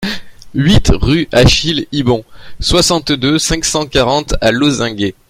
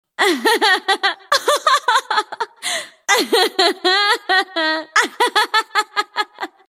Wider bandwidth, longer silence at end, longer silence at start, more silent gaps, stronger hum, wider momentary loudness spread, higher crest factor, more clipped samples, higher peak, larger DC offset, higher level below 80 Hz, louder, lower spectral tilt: about the same, 16.5 kHz vs 16.5 kHz; about the same, 0.2 s vs 0.25 s; second, 0 s vs 0.2 s; neither; neither; about the same, 8 LU vs 9 LU; about the same, 12 dB vs 16 dB; neither; about the same, 0 dBFS vs -2 dBFS; neither; first, -24 dBFS vs -72 dBFS; first, -12 LUFS vs -16 LUFS; first, -4.5 dB/octave vs 0.5 dB/octave